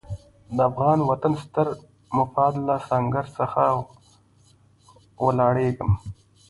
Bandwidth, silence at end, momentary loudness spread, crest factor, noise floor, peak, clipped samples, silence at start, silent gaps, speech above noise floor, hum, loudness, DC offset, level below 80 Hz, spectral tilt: 11.5 kHz; 0.35 s; 11 LU; 18 dB; -57 dBFS; -6 dBFS; under 0.1%; 0.1 s; none; 35 dB; none; -23 LUFS; under 0.1%; -46 dBFS; -9 dB/octave